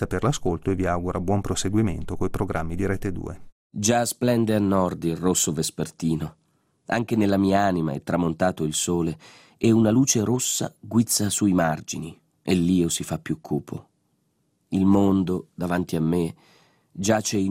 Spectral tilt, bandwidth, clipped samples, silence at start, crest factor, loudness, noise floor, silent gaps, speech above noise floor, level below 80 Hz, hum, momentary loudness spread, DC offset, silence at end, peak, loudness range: -5 dB/octave; 16 kHz; under 0.1%; 0 s; 16 dB; -24 LUFS; -70 dBFS; 3.52-3.70 s; 47 dB; -46 dBFS; none; 10 LU; under 0.1%; 0 s; -8 dBFS; 3 LU